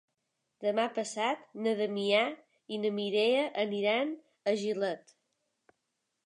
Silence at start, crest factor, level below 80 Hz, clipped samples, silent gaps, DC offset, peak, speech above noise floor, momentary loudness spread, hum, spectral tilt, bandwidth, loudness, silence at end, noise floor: 0.6 s; 20 dB; -88 dBFS; under 0.1%; none; under 0.1%; -12 dBFS; 52 dB; 8 LU; none; -4 dB/octave; 11 kHz; -31 LUFS; 1.25 s; -83 dBFS